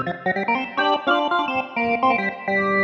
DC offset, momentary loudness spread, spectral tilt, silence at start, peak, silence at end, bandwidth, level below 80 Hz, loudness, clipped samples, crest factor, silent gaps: under 0.1%; 4 LU; -6 dB/octave; 0 s; -6 dBFS; 0 s; 7.8 kHz; -62 dBFS; -21 LUFS; under 0.1%; 16 dB; none